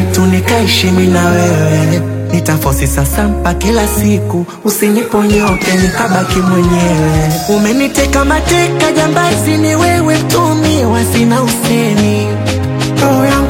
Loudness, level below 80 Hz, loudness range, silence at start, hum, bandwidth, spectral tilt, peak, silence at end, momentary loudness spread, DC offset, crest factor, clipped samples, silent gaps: -11 LUFS; -24 dBFS; 2 LU; 0 s; none; 17 kHz; -5 dB/octave; 0 dBFS; 0 s; 4 LU; under 0.1%; 10 dB; under 0.1%; none